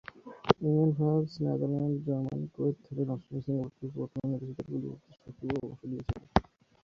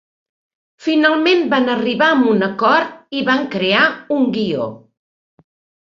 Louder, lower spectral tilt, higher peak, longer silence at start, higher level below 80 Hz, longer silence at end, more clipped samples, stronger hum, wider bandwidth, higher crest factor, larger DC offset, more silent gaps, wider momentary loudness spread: second, -32 LUFS vs -16 LUFS; first, -9 dB/octave vs -6 dB/octave; second, -6 dBFS vs -2 dBFS; second, 0.15 s vs 0.8 s; first, -52 dBFS vs -62 dBFS; second, 0.4 s vs 1.1 s; neither; neither; second, 6.6 kHz vs 7.4 kHz; first, 26 dB vs 16 dB; neither; neither; first, 13 LU vs 8 LU